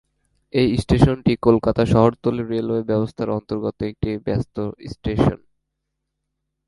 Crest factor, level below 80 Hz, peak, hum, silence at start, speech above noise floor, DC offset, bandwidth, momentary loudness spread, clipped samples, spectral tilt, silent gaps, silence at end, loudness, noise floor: 20 dB; -38 dBFS; 0 dBFS; none; 0.55 s; 59 dB; under 0.1%; 11.5 kHz; 10 LU; under 0.1%; -8 dB/octave; none; 1.3 s; -20 LUFS; -78 dBFS